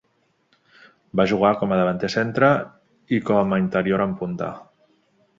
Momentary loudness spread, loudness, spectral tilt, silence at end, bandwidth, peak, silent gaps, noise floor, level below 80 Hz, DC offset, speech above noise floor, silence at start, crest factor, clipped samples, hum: 10 LU; -21 LUFS; -7 dB/octave; 0.8 s; 7.6 kHz; -2 dBFS; none; -66 dBFS; -56 dBFS; under 0.1%; 46 dB; 1.15 s; 20 dB; under 0.1%; none